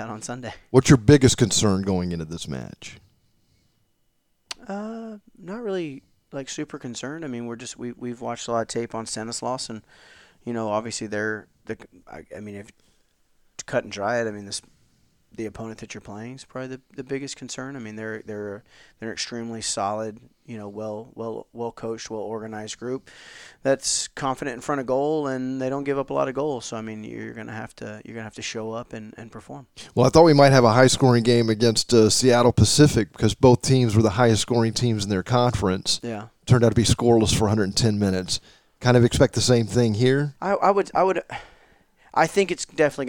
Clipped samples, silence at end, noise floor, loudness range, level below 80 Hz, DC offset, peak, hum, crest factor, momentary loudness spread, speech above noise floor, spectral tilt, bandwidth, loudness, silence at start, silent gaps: under 0.1%; 0 s; -70 dBFS; 16 LU; -46 dBFS; under 0.1%; 0 dBFS; none; 22 dB; 21 LU; 48 dB; -5 dB/octave; 17.5 kHz; -22 LUFS; 0 s; none